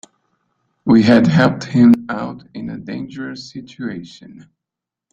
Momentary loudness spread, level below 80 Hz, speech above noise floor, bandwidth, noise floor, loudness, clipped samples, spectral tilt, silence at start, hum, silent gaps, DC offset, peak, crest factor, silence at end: 20 LU; -54 dBFS; 69 dB; 7.6 kHz; -85 dBFS; -14 LUFS; under 0.1%; -7.5 dB/octave; 0.85 s; none; none; under 0.1%; -2 dBFS; 16 dB; 1.05 s